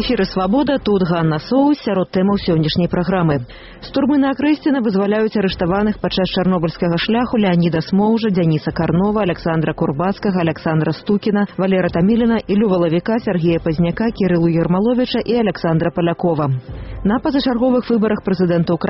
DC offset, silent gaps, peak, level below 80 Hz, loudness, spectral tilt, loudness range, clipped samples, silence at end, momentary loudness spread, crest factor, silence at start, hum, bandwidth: under 0.1%; none; -4 dBFS; -40 dBFS; -17 LUFS; -6 dB/octave; 1 LU; under 0.1%; 0 s; 3 LU; 12 dB; 0 s; none; 6 kHz